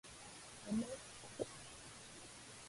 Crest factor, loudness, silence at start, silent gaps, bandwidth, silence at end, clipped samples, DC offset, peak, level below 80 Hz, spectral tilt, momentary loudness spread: 22 dB; -48 LUFS; 0.05 s; none; 11.5 kHz; 0 s; under 0.1%; under 0.1%; -28 dBFS; -70 dBFS; -4 dB/octave; 11 LU